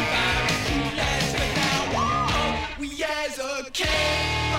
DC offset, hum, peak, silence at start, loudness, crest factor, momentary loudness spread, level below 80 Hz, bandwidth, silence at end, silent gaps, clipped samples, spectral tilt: under 0.1%; none; -10 dBFS; 0 s; -24 LUFS; 14 dB; 7 LU; -36 dBFS; 16.5 kHz; 0 s; none; under 0.1%; -3.5 dB/octave